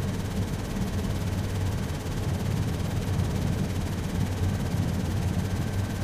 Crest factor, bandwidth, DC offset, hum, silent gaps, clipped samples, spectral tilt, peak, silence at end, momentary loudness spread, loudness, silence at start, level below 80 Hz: 14 dB; 15.5 kHz; under 0.1%; none; none; under 0.1%; -6.5 dB/octave; -14 dBFS; 0 s; 2 LU; -29 LUFS; 0 s; -38 dBFS